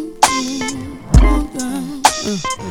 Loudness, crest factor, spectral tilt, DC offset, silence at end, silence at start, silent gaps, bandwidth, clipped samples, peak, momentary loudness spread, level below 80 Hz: -17 LUFS; 16 dB; -4 dB/octave; under 0.1%; 0 s; 0 s; none; 18.5 kHz; 0.2%; 0 dBFS; 10 LU; -20 dBFS